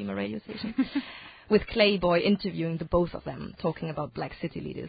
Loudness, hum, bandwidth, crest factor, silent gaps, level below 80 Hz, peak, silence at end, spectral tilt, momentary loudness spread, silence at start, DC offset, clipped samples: -28 LUFS; none; 5 kHz; 20 dB; none; -48 dBFS; -8 dBFS; 0 s; -10.5 dB/octave; 13 LU; 0 s; under 0.1%; under 0.1%